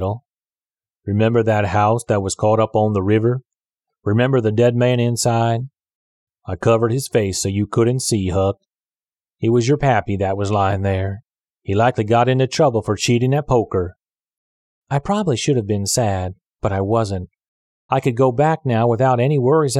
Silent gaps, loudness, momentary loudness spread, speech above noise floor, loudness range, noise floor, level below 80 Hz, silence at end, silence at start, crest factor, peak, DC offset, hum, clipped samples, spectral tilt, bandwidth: 5.95-6.27 s, 14.37-14.82 s, 17.48-17.89 s; -18 LUFS; 10 LU; over 73 dB; 3 LU; under -90 dBFS; -48 dBFS; 0 s; 0 s; 16 dB; -4 dBFS; under 0.1%; none; under 0.1%; -6 dB/octave; 13.5 kHz